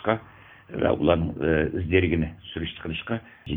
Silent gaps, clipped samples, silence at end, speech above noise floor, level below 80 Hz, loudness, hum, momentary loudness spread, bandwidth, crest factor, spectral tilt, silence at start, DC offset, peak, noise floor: none; under 0.1%; 0 s; 24 dB; -44 dBFS; -26 LUFS; none; 11 LU; 3.9 kHz; 22 dB; -10 dB/octave; 0 s; under 0.1%; -4 dBFS; -49 dBFS